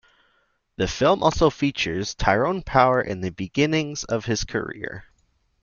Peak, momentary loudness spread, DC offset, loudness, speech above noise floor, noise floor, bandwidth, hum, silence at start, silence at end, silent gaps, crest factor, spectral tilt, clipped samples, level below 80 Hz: -2 dBFS; 10 LU; under 0.1%; -22 LUFS; 45 dB; -67 dBFS; 7.4 kHz; none; 0.8 s; 0.6 s; none; 22 dB; -5 dB/octave; under 0.1%; -40 dBFS